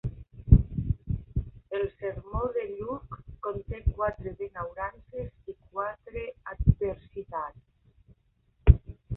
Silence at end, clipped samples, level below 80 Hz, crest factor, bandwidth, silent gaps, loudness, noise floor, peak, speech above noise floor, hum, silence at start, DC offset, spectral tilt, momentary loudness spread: 0 s; under 0.1%; -32 dBFS; 26 dB; 3.8 kHz; none; -30 LUFS; -68 dBFS; -2 dBFS; 35 dB; none; 0.05 s; under 0.1%; -12 dB/octave; 16 LU